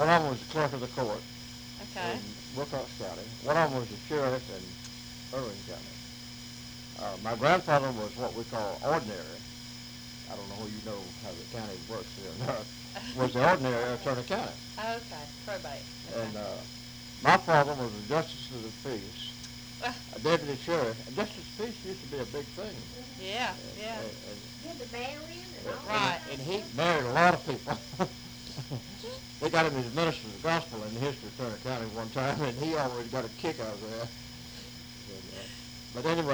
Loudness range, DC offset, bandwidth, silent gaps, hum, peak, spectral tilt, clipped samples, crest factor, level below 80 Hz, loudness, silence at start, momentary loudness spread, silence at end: 8 LU; under 0.1%; over 20 kHz; none; none; -6 dBFS; -4.5 dB/octave; under 0.1%; 28 dB; -58 dBFS; -33 LUFS; 0 s; 16 LU; 0 s